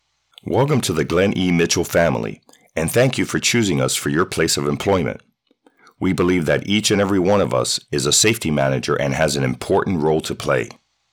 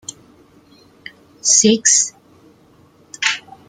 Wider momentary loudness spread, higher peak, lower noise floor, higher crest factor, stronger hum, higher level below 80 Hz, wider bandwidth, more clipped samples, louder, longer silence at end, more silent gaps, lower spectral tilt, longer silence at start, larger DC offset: second, 6 LU vs 11 LU; second, -4 dBFS vs 0 dBFS; first, -59 dBFS vs -50 dBFS; second, 14 dB vs 20 dB; neither; first, -46 dBFS vs -64 dBFS; first, over 20 kHz vs 11 kHz; neither; second, -18 LUFS vs -14 LUFS; first, 0.45 s vs 0.3 s; neither; first, -4 dB/octave vs -1 dB/octave; second, 0.45 s vs 1.45 s; neither